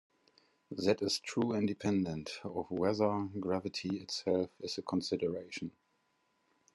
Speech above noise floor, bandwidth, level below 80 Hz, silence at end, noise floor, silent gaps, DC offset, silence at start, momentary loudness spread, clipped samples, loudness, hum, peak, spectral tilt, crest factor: 42 dB; 12 kHz; -74 dBFS; 1.05 s; -77 dBFS; none; under 0.1%; 0.7 s; 9 LU; under 0.1%; -35 LUFS; none; -16 dBFS; -5.5 dB/octave; 20 dB